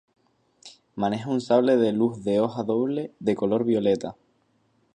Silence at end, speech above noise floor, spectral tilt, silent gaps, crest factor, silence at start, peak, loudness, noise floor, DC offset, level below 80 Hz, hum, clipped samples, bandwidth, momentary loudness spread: 0.85 s; 44 dB; -7 dB/octave; none; 18 dB; 0.65 s; -8 dBFS; -24 LUFS; -67 dBFS; under 0.1%; -64 dBFS; none; under 0.1%; 9.8 kHz; 7 LU